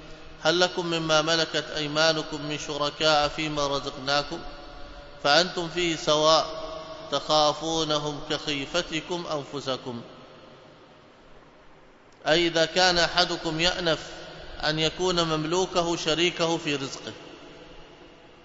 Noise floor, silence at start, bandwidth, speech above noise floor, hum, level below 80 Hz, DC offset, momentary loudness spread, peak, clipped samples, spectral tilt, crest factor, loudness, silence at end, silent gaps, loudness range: -52 dBFS; 0 s; 8 kHz; 27 dB; none; -50 dBFS; under 0.1%; 17 LU; -4 dBFS; under 0.1%; -3 dB/octave; 22 dB; -25 LUFS; 0.05 s; none; 7 LU